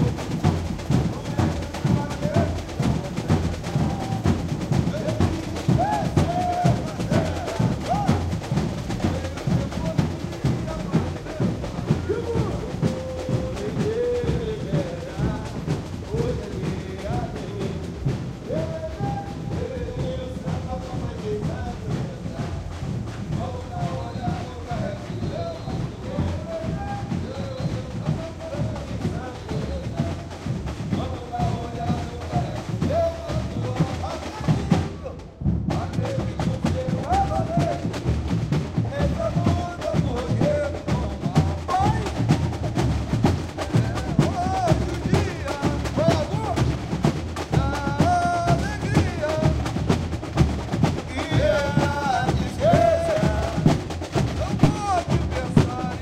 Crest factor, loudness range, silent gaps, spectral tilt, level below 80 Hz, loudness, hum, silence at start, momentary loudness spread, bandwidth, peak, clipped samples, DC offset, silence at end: 20 dB; 7 LU; none; -7 dB/octave; -36 dBFS; -25 LUFS; none; 0 s; 8 LU; 14 kHz; -2 dBFS; under 0.1%; under 0.1%; 0 s